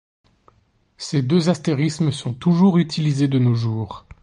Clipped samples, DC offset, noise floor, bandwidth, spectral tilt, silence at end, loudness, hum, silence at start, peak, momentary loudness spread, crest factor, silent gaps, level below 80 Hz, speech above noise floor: under 0.1%; under 0.1%; -61 dBFS; 10.5 kHz; -7 dB/octave; 0.25 s; -19 LUFS; none; 1 s; -4 dBFS; 9 LU; 16 dB; none; -54 dBFS; 42 dB